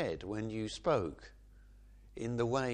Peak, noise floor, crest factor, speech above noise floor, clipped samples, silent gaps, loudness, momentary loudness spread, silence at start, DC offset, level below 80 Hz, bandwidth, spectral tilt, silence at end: -18 dBFS; -58 dBFS; 18 dB; 22 dB; under 0.1%; none; -37 LUFS; 21 LU; 0 s; under 0.1%; -56 dBFS; 10 kHz; -6 dB/octave; 0 s